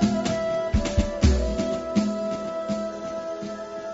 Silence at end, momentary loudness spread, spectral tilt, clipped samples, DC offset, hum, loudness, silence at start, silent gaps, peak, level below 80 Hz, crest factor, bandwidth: 0 s; 10 LU; -6.5 dB/octave; under 0.1%; under 0.1%; none; -26 LUFS; 0 s; none; -6 dBFS; -30 dBFS; 18 dB; 8 kHz